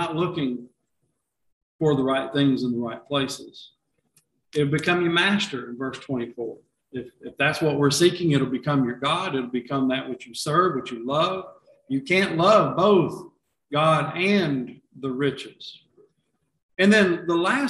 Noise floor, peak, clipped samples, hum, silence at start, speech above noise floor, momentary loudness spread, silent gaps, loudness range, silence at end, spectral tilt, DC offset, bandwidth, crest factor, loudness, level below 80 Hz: -76 dBFS; -4 dBFS; under 0.1%; none; 0 s; 53 dB; 17 LU; 1.53-1.79 s, 16.63-16.69 s; 4 LU; 0 s; -5.5 dB/octave; under 0.1%; 12.5 kHz; 20 dB; -23 LUFS; -62 dBFS